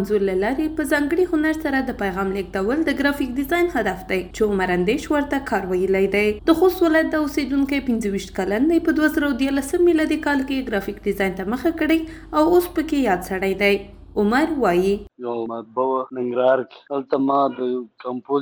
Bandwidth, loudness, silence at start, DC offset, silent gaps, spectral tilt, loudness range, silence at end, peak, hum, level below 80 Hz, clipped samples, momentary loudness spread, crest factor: over 20 kHz; -21 LUFS; 0 s; under 0.1%; none; -5.5 dB/octave; 2 LU; 0 s; -4 dBFS; none; -42 dBFS; under 0.1%; 8 LU; 16 dB